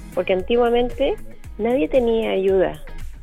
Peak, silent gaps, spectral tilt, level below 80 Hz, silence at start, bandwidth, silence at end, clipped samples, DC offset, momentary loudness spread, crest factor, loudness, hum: -6 dBFS; none; -6.5 dB/octave; -34 dBFS; 0 s; 14.5 kHz; 0 s; under 0.1%; under 0.1%; 14 LU; 14 dB; -20 LUFS; none